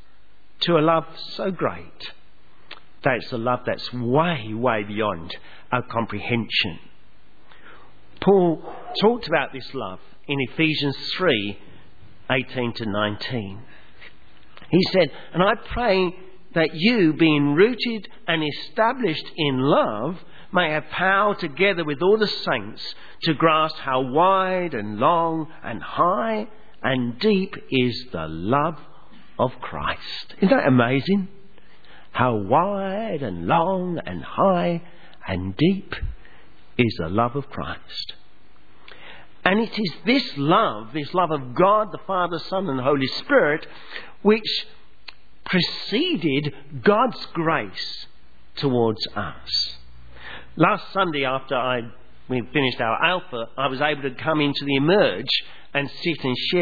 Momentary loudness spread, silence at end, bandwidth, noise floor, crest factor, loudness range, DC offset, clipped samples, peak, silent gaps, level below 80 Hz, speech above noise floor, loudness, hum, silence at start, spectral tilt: 13 LU; 0 s; 5 kHz; -58 dBFS; 22 dB; 5 LU; 1%; under 0.1%; 0 dBFS; none; -50 dBFS; 36 dB; -22 LUFS; none; 0.6 s; -7 dB/octave